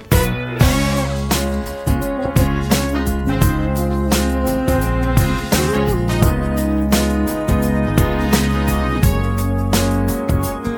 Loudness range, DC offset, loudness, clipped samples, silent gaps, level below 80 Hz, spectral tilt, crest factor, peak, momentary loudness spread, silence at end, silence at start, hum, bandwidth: 1 LU; under 0.1%; -17 LUFS; under 0.1%; none; -22 dBFS; -5.5 dB/octave; 16 dB; 0 dBFS; 3 LU; 0 s; 0 s; none; 18 kHz